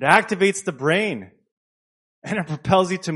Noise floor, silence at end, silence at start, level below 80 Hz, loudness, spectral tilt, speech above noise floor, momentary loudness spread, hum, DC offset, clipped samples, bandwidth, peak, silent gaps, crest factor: under -90 dBFS; 0 s; 0 s; -58 dBFS; -21 LUFS; -4.5 dB/octave; over 70 dB; 11 LU; none; under 0.1%; under 0.1%; 11.5 kHz; 0 dBFS; 1.52-2.22 s; 22 dB